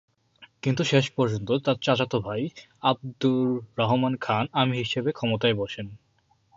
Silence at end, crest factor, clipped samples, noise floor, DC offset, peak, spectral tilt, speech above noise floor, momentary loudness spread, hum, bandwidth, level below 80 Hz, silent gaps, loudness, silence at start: 0.6 s; 20 dB; under 0.1%; -66 dBFS; under 0.1%; -6 dBFS; -6 dB/octave; 41 dB; 8 LU; none; 7.8 kHz; -60 dBFS; none; -25 LUFS; 0.4 s